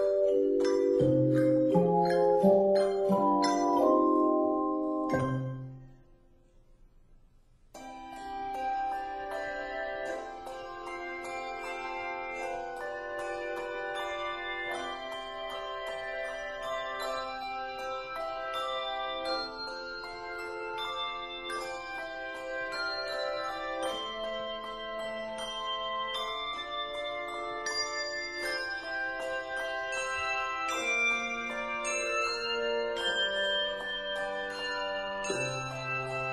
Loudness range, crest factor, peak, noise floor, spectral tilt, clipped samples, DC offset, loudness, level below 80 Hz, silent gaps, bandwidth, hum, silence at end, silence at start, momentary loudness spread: 11 LU; 20 dB; -12 dBFS; -60 dBFS; -4.5 dB/octave; under 0.1%; under 0.1%; -32 LUFS; -58 dBFS; none; 13.5 kHz; none; 0 s; 0 s; 12 LU